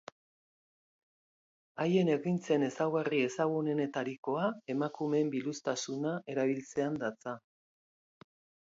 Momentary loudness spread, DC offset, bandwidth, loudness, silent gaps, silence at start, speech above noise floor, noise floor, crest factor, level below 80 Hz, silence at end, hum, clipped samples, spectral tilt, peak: 7 LU; under 0.1%; 7.8 kHz; -33 LUFS; 4.18-4.23 s; 1.75 s; over 57 dB; under -90 dBFS; 18 dB; -80 dBFS; 1.3 s; none; under 0.1%; -6 dB/octave; -16 dBFS